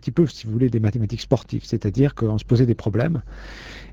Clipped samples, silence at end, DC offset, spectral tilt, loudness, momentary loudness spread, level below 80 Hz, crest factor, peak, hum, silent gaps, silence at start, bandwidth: under 0.1%; 0 s; under 0.1%; -8 dB/octave; -22 LUFS; 14 LU; -40 dBFS; 18 dB; -2 dBFS; none; none; 0.05 s; 7.6 kHz